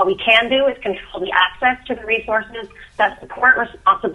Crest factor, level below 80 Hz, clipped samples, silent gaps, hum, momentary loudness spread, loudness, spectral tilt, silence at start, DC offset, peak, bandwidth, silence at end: 18 dB; -48 dBFS; under 0.1%; none; none; 13 LU; -17 LUFS; -4.5 dB/octave; 0 s; under 0.1%; 0 dBFS; 11 kHz; 0 s